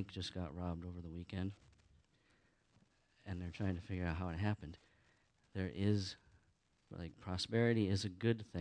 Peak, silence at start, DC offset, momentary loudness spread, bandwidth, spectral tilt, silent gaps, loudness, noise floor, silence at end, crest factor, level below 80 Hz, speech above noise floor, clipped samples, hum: -22 dBFS; 0 s; under 0.1%; 16 LU; 10 kHz; -6.5 dB/octave; none; -41 LUFS; -76 dBFS; 0 s; 20 dB; -62 dBFS; 36 dB; under 0.1%; none